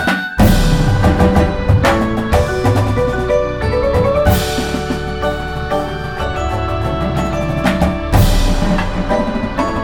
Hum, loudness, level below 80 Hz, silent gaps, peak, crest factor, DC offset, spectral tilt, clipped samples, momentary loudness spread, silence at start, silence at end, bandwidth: none; -15 LUFS; -20 dBFS; none; 0 dBFS; 14 dB; 1%; -6 dB/octave; under 0.1%; 7 LU; 0 s; 0 s; 18 kHz